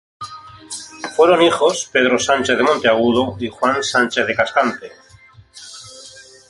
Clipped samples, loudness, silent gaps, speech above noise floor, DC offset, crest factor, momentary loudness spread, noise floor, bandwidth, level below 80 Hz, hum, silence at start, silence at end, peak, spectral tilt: under 0.1%; -16 LUFS; none; 31 dB; under 0.1%; 18 dB; 21 LU; -46 dBFS; 11.5 kHz; -54 dBFS; none; 0.2 s; 0.3 s; 0 dBFS; -3 dB/octave